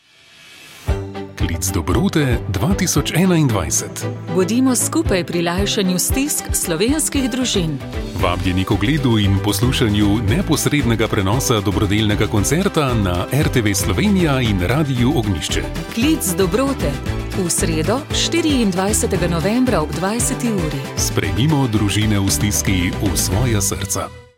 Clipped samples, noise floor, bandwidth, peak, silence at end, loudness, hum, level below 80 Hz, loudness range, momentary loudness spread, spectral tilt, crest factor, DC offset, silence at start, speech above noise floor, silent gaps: under 0.1%; -46 dBFS; 17 kHz; 0 dBFS; 0.15 s; -17 LUFS; none; -30 dBFS; 2 LU; 6 LU; -4.5 dB/octave; 16 dB; under 0.1%; 0.5 s; 29 dB; none